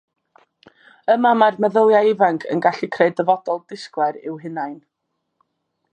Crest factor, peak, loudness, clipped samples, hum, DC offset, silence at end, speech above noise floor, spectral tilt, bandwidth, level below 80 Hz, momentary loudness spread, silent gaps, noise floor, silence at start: 18 dB; -2 dBFS; -18 LUFS; under 0.1%; none; under 0.1%; 1.15 s; 58 dB; -6.5 dB/octave; 9 kHz; -76 dBFS; 14 LU; none; -75 dBFS; 1.1 s